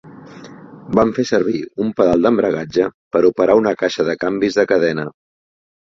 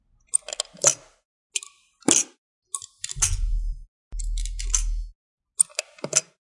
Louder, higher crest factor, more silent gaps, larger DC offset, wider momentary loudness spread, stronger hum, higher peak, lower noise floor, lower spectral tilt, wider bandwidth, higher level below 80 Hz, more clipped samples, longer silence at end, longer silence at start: first, -17 LUFS vs -25 LUFS; second, 16 dB vs 28 dB; second, 2.94-3.11 s vs 1.25-1.50 s, 2.38-2.62 s, 3.88-4.11 s, 5.15-5.38 s; neither; second, 7 LU vs 17 LU; neither; about the same, -2 dBFS vs 0 dBFS; second, -37 dBFS vs -48 dBFS; first, -6 dB/octave vs -1.5 dB/octave; second, 7.6 kHz vs 11.5 kHz; second, -50 dBFS vs -32 dBFS; neither; first, 0.85 s vs 0.25 s; second, 0.05 s vs 0.35 s